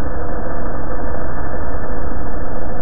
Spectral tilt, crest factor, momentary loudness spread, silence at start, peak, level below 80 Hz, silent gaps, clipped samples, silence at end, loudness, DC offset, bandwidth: -12 dB/octave; 12 dB; 1 LU; 0 s; -4 dBFS; -26 dBFS; none; under 0.1%; 0 s; -26 LUFS; 40%; 2.2 kHz